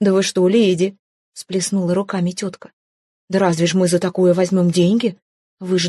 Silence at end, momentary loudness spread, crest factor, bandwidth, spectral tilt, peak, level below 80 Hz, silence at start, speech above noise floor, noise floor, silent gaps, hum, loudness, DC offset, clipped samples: 0 s; 10 LU; 14 dB; 12.5 kHz; -5.5 dB/octave; -4 dBFS; -62 dBFS; 0 s; over 73 dB; under -90 dBFS; 0.99-1.33 s, 2.73-3.28 s, 5.22-5.57 s; none; -17 LUFS; under 0.1%; under 0.1%